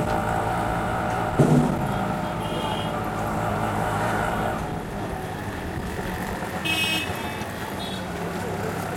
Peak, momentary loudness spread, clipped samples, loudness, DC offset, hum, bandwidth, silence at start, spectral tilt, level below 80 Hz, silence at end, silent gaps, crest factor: -6 dBFS; 9 LU; under 0.1%; -26 LUFS; under 0.1%; none; 17 kHz; 0 s; -5.5 dB/octave; -40 dBFS; 0 s; none; 20 dB